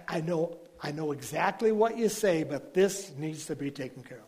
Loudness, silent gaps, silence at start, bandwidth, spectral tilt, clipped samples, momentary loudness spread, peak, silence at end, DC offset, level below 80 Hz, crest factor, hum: -30 LUFS; none; 0 s; 15.5 kHz; -5 dB/octave; under 0.1%; 11 LU; -12 dBFS; 0.05 s; under 0.1%; -68 dBFS; 18 dB; none